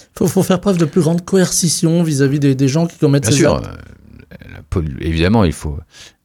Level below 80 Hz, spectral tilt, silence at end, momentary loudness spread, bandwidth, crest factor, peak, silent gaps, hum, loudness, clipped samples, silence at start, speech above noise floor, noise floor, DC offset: -34 dBFS; -5.5 dB/octave; 0.2 s; 9 LU; 18 kHz; 14 dB; 0 dBFS; none; none; -15 LUFS; under 0.1%; 0.15 s; 24 dB; -39 dBFS; under 0.1%